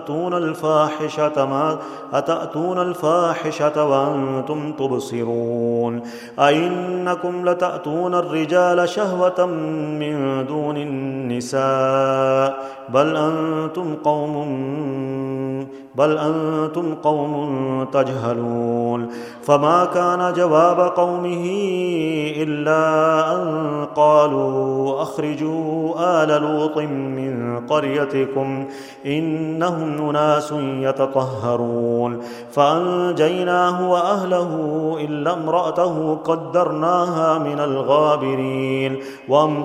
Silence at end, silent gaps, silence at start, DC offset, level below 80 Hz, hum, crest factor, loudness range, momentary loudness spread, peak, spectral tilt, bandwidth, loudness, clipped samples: 0 s; none; 0 s; under 0.1%; -66 dBFS; none; 18 dB; 4 LU; 8 LU; 0 dBFS; -6.5 dB/octave; 13.5 kHz; -20 LUFS; under 0.1%